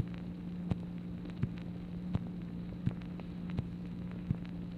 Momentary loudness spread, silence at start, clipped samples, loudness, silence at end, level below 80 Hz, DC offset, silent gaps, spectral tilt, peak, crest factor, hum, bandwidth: 4 LU; 0 s; under 0.1%; -41 LUFS; 0 s; -52 dBFS; under 0.1%; none; -9.5 dB/octave; -20 dBFS; 20 dB; none; 5 kHz